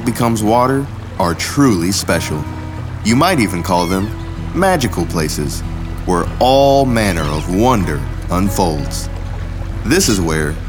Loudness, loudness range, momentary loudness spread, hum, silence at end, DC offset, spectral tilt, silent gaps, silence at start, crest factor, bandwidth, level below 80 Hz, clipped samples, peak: -16 LUFS; 2 LU; 12 LU; none; 0 s; under 0.1%; -5 dB/octave; none; 0 s; 14 dB; over 20 kHz; -28 dBFS; under 0.1%; 0 dBFS